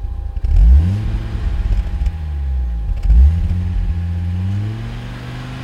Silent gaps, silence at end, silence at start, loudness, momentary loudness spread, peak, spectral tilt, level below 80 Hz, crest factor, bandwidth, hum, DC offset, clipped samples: none; 0 s; 0 s; -19 LUFS; 14 LU; -2 dBFS; -8 dB/octave; -16 dBFS; 14 dB; 5.6 kHz; none; under 0.1%; under 0.1%